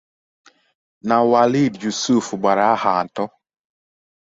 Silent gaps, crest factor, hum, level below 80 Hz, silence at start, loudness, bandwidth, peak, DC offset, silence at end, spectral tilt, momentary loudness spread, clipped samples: none; 18 dB; none; -62 dBFS; 1.05 s; -18 LUFS; 8 kHz; -2 dBFS; under 0.1%; 1.05 s; -5 dB/octave; 12 LU; under 0.1%